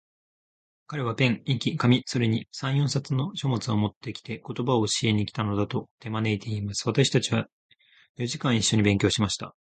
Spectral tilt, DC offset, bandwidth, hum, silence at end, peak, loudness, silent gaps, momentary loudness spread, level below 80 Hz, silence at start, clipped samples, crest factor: -5 dB/octave; under 0.1%; 9.4 kHz; none; 0.15 s; -8 dBFS; -26 LUFS; 3.96-4.01 s, 5.91-5.98 s, 7.52-7.69 s, 8.09-8.15 s; 10 LU; -54 dBFS; 0.9 s; under 0.1%; 18 dB